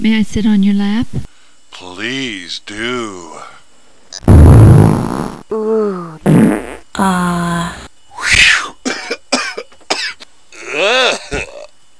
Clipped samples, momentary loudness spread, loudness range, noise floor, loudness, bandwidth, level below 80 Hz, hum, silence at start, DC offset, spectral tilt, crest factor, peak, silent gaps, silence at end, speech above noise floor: 0.8%; 20 LU; 8 LU; -49 dBFS; -12 LUFS; 11 kHz; -22 dBFS; none; 0 s; under 0.1%; -5.5 dB/octave; 14 dB; 0 dBFS; none; 0.35 s; 33 dB